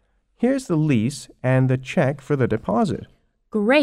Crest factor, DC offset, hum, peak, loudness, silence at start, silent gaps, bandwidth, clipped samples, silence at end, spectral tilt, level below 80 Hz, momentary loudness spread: 18 dB; under 0.1%; none; -4 dBFS; -22 LUFS; 0.4 s; none; 12 kHz; under 0.1%; 0 s; -7 dB/octave; -52 dBFS; 7 LU